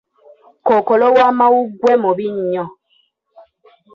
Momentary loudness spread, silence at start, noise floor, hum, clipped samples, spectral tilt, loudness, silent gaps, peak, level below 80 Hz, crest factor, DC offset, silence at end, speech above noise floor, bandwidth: 11 LU; 0.65 s; -61 dBFS; none; under 0.1%; -7 dB/octave; -14 LUFS; none; -2 dBFS; -62 dBFS; 14 dB; under 0.1%; 1.25 s; 47 dB; 6.8 kHz